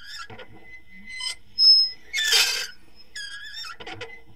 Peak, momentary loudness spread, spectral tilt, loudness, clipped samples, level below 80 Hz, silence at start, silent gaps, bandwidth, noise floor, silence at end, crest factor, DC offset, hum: -6 dBFS; 25 LU; 2 dB/octave; -18 LUFS; under 0.1%; -60 dBFS; 0.05 s; none; 16 kHz; -48 dBFS; 0.2 s; 20 dB; 0.7%; none